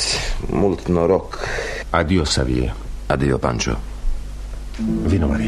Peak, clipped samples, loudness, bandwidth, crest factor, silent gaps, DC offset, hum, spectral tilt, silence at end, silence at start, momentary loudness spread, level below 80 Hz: -2 dBFS; under 0.1%; -21 LUFS; 13 kHz; 18 dB; none; under 0.1%; none; -5 dB/octave; 0 s; 0 s; 13 LU; -26 dBFS